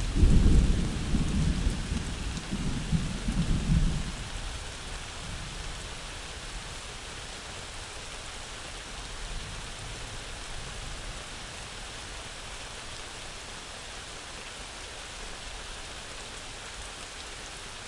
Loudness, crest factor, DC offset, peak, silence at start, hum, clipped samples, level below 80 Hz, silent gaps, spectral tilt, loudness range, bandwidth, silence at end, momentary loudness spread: -34 LUFS; 22 dB; under 0.1%; -10 dBFS; 0 s; none; under 0.1%; -34 dBFS; none; -4.5 dB/octave; 9 LU; 11.5 kHz; 0 s; 11 LU